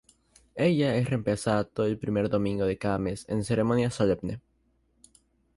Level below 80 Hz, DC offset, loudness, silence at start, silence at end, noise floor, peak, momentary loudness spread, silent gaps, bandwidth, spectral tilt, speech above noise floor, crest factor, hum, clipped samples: -52 dBFS; under 0.1%; -27 LUFS; 0.55 s; 1.15 s; -69 dBFS; -12 dBFS; 7 LU; none; 11.5 kHz; -7 dB/octave; 43 dB; 16 dB; none; under 0.1%